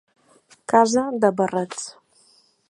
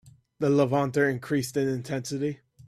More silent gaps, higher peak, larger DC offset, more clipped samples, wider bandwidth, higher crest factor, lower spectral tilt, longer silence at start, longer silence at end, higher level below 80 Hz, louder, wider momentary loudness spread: neither; first, -2 dBFS vs -10 dBFS; neither; neither; second, 11.5 kHz vs 14 kHz; about the same, 20 dB vs 18 dB; second, -4.5 dB/octave vs -6 dB/octave; first, 0.7 s vs 0.05 s; first, 0.8 s vs 0.3 s; about the same, -68 dBFS vs -64 dBFS; first, -20 LUFS vs -27 LUFS; first, 17 LU vs 8 LU